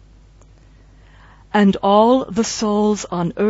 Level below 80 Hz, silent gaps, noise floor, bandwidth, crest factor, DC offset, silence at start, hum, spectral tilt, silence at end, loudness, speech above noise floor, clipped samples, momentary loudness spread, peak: -48 dBFS; none; -46 dBFS; 8 kHz; 16 dB; under 0.1%; 1.55 s; none; -5.5 dB/octave; 0 s; -17 LUFS; 31 dB; under 0.1%; 8 LU; -2 dBFS